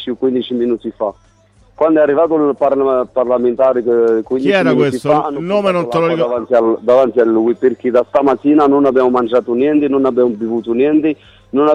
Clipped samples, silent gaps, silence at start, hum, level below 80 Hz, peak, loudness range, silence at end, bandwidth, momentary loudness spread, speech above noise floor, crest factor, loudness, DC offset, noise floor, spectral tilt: under 0.1%; none; 0 s; none; -52 dBFS; -2 dBFS; 2 LU; 0 s; 11 kHz; 6 LU; 36 dB; 12 dB; -14 LUFS; under 0.1%; -49 dBFS; -7.5 dB/octave